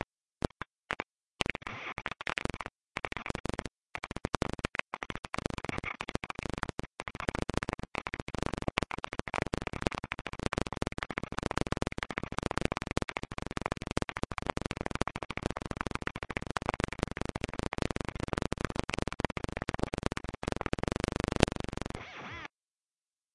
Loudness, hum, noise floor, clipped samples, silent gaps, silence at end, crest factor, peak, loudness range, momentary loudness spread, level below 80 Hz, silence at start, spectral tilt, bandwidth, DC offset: -37 LUFS; none; under -90 dBFS; under 0.1%; 1.31-1.35 s, 3.40-3.44 s, 5.19-5.23 s, 8.22-8.26 s; 0.85 s; 36 dB; 0 dBFS; 3 LU; 6 LU; -46 dBFS; 0.9 s; -5 dB/octave; 11.5 kHz; under 0.1%